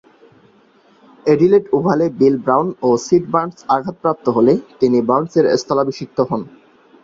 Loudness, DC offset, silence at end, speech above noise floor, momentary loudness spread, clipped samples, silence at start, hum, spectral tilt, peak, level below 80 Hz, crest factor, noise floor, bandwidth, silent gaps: -16 LUFS; under 0.1%; 0.55 s; 36 dB; 7 LU; under 0.1%; 1.25 s; none; -7 dB/octave; -2 dBFS; -56 dBFS; 14 dB; -52 dBFS; 7.6 kHz; none